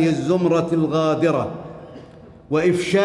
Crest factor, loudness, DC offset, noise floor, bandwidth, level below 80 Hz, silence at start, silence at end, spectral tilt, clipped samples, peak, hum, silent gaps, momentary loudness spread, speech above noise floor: 14 dB; -20 LUFS; under 0.1%; -43 dBFS; 11.5 kHz; -56 dBFS; 0 s; 0 s; -6.5 dB/octave; under 0.1%; -6 dBFS; none; none; 18 LU; 24 dB